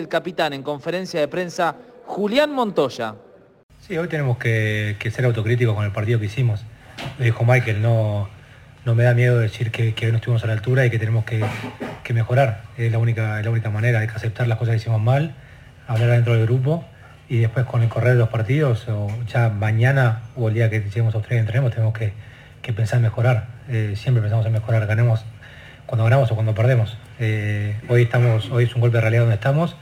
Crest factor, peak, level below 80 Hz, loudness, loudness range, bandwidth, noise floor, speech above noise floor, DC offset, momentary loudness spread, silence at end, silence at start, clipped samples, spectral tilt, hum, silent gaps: 16 dB; -4 dBFS; -52 dBFS; -20 LUFS; 3 LU; 10 kHz; -44 dBFS; 25 dB; under 0.1%; 10 LU; 0 s; 0 s; under 0.1%; -7.5 dB/octave; none; 3.63-3.69 s